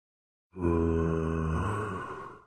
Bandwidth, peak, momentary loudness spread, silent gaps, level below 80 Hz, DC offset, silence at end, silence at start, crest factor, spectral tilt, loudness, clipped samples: 9.6 kHz; -16 dBFS; 11 LU; none; -42 dBFS; under 0.1%; 0.1 s; 0.55 s; 16 dB; -8.5 dB/octave; -31 LUFS; under 0.1%